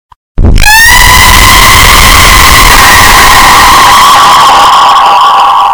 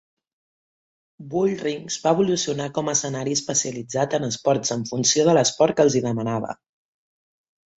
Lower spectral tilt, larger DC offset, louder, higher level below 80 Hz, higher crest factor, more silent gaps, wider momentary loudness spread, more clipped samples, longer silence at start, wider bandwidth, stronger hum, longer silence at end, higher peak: second, -1.5 dB/octave vs -4 dB/octave; neither; first, 0 LUFS vs -22 LUFS; first, -10 dBFS vs -62 dBFS; second, 2 dB vs 20 dB; neither; second, 3 LU vs 9 LU; first, 80% vs under 0.1%; second, 0.35 s vs 1.2 s; first, over 20 kHz vs 8.4 kHz; neither; second, 0 s vs 1.25 s; first, 0 dBFS vs -4 dBFS